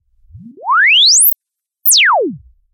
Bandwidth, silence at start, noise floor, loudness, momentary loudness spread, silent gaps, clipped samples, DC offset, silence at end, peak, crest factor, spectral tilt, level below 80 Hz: 16.5 kHz; 0.35 s; -76 dBFS; -8 LUFS; 17 LU; none; under 0.1%; under 0.1%; 0.35 s; 0 dBFS; 12 dB; 1 dB/octave; -54 dBFS